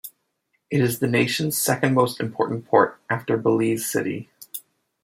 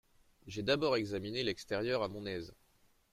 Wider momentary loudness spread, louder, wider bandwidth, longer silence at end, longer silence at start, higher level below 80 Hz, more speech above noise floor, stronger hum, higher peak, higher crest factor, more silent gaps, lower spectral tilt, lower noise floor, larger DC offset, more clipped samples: first, 16 LU vs 12 LU; first, -22 LUFS vs -36 LUFS; about the same, 16.5 kHz vs 15 kHz; second, 0.45 s vs 0.6 s; second, 0.05 s vs 0.45 s; about the same, -64 dBFS vs -64 dBFS; first, 51 dB vs 34 dB; neither; first, -2 dBFS vs -16 dBFS; about the same, 20 dB vs 22 dB; neither; about the same, -5 dB/octave vs -5 dB/octave; about the same, -73 dBFS vs -70 dBFS; neither; neither